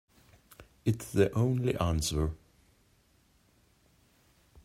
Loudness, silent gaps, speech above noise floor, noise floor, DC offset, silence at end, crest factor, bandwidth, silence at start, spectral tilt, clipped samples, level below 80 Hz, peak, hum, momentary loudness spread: -30 LUFS; none; 38 dB; -67 dBFS; under 0.1%; 2.3 s; 20 dB; 16 kHz; 0.6 s; -6 dB/octave; under 0.1%; -48 dBFS; -12 dBFS; none; 8 LU